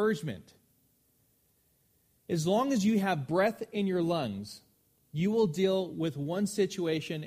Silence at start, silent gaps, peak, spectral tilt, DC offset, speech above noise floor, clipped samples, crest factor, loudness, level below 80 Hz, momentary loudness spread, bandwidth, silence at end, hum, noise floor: 0 s; none; -14 dBFS; -6 dB/octave; under 0.1%; 41 dB; under 0.1%; 18 dB; -30 LUFS; -68 dBFS; 13 LU; 15.5 kHz; 0 s; none; -71 dBFS